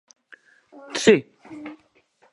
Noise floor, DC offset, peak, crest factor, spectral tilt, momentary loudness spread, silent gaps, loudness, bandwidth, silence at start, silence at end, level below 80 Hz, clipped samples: -61 dBFS; under 0.1%; -2 dBFS; 24 dB; -4 dB/octave; 23 LU; none; -20 LUFS; 11.5 kHz; 0.9 s; 0.6 s; -64 dBFS; under 0.1%